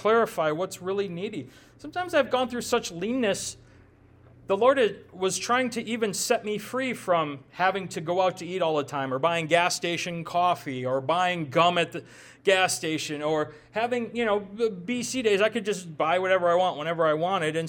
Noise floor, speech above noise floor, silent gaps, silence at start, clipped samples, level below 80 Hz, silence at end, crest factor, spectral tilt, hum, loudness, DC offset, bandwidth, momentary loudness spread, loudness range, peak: -55 dBFS; 29 dB; none; 0 s; under 0.1%; -66 dBFS; 0 s; 18 dB; -3.5 dB/octave; none; -26 LUFS; under 0.1%; 18 kHz; 8 LU; 3 LU; -8 dBFS